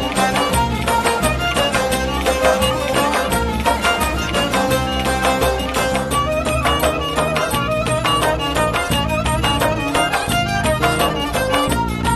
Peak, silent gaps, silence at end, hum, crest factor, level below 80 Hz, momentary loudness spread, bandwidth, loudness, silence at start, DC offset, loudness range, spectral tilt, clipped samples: -2 dBFS; none; 0 s; none; 16 dB; -28 dBFS; 2 LU; 14 kHz; -17 LUFS; 0 s; under 0.1%; 1 LU; -4 dB/octave; under 0.1%